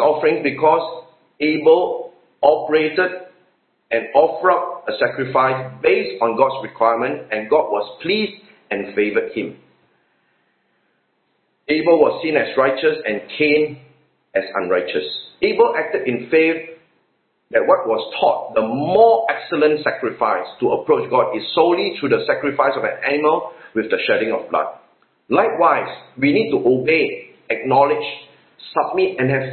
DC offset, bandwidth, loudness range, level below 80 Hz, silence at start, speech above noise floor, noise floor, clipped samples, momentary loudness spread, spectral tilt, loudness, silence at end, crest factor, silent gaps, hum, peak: under 0.1%; 4.5 kHz; 4 LU; -62 dBFS; 0 s; 49 dB; -66 dBFS; under 0.1%; 9 LU; -10.5 dB/octave; -18 LUFS; 0 s; 18 dB; none; none; 0 dBFS